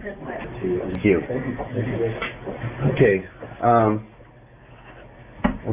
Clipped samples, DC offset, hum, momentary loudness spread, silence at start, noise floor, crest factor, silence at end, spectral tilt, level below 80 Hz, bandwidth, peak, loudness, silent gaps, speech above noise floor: under 0.1%; under 0.1%; none; 14 LU; 0 s; -48 dBFS; 18 dB; 0 s; -11.5 dB/octave; -44 dBFS; 3.9 kHz; -4 dBFS; -23 LUFS; none; 26 dB